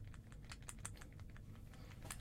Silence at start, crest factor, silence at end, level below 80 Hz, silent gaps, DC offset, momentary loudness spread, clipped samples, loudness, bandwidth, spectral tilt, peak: 0 s; 24 dB; 0 s; -58 dBFS; none; under 0.1%; 6 LU; under 0.1%; -55 LUFS; 16.5 kHz; -3.5 dB/octave; -30 dBFS